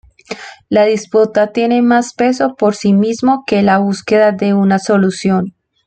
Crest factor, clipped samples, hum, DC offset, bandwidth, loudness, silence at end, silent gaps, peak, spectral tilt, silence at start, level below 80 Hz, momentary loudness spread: 12 dB; under 0.1%; none; under 0.1%; 9 kHz; -13 LUFS; 0.35 s; none; 0 dBFS; -6 dB/octave; 0.3 s; -54 dBFS; 6 LU